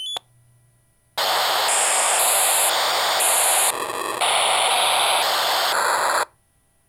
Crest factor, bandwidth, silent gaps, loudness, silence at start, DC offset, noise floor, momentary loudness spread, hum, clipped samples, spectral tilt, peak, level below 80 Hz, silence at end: 16 dB; over 20 kHz; none; -18 LUFS; 0 s; under 0.1%; -62 dBFS; 9 LU; none; under 0.1%; 2 dB/octave; -6 dBFS; -68 dBFS; 0.65 s